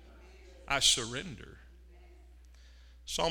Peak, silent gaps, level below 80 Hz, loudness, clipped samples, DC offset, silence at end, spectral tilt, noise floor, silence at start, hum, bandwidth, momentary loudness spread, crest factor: -12 dBFS; none; -52 dBFS; -29 LUFS; under 0.1%; under 0.1%; 0 s; -1 dB/octave; -55 dBFS; 0 s; none; 17.5 kHz; 25 LU; 24 dB